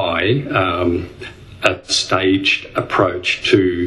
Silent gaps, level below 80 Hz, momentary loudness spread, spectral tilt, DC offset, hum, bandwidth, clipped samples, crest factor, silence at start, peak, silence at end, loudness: none; -46 dBFS; 8 LU; -4.5 dB/octave; under 0.1%; none; 12 kHz; under 0.1%; 18 dB; 0 s; 0 dBFS; 0 s; -17 LUFS